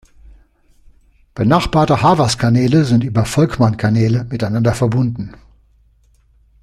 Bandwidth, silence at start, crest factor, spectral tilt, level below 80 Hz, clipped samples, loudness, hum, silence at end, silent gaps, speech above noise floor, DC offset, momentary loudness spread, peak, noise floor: 13 kHz; 1.35 s; 16 dB; -6.5 dB/octave; -38 dBFS; under 0.1%; -15 LUFS; none; 1.3 s; none; 39 dB; under 0.1%; 7 LU; 0 dBFS; -53 dBFS